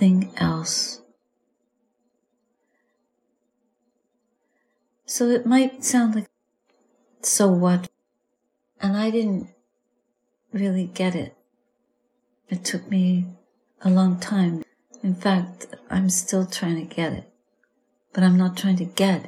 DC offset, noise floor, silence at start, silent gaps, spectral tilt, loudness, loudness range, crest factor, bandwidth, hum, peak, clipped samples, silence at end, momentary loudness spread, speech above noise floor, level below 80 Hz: under 0.1%; -75 dBFS; 0 s; none; -5 dB/octave; -22 LUFS; 7 LU; 18 dB; 15 kHz; none; -6 dBFS; under 0.1%; 0 s; 14 LU; 53 dB; -62 dBFS